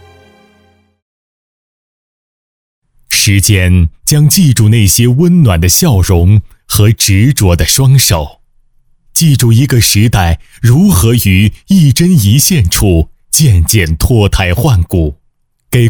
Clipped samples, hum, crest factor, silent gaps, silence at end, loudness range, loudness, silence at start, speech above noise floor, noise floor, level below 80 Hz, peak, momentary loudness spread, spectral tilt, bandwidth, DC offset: 0.2%; none; 8 dB; none; 0 s; 3 LU; -8 LUFS; 3.1 s; 48 dB; -55 dBFS; -22 dBFS; 0 dBFS; 5 LU; -4.5 dB/octave; over 20 kHz; under 0.1%